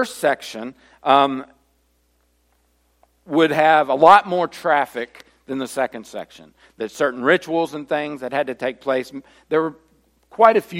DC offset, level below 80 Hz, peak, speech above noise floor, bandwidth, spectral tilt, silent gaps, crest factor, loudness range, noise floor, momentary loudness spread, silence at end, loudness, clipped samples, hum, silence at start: under 0.1%; -64 dBFS; 0 dBFS; 44 dB; 16.5 kHz; -4.5 dB/octave; none; 20 dB; 6 LU; -63 dBFS; 19 LU; 0 s; -19 LUFS; under 0.1%; 60 Hz at -60 dBFS; 0 s